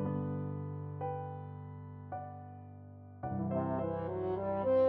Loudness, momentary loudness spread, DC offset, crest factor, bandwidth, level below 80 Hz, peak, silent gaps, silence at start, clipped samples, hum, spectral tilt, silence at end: -39 LUFS; 15 LU; under 0.1%; 16 dB; 4.4 kHz; -66 dBFS; -20 dBFS; none; 0 s; under 0.1%; none; -9.5 dB/octave; 0 s